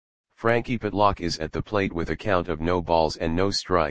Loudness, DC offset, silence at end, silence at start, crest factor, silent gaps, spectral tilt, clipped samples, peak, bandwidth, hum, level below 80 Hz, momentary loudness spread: -25 LUFS; 1%; 0 s; 0.25 s; 20 dB; none; -5.5 dB/octave; under 0.1%; -4 dBFS; 9.8 kHz; none; -42 dBFS; 6 LU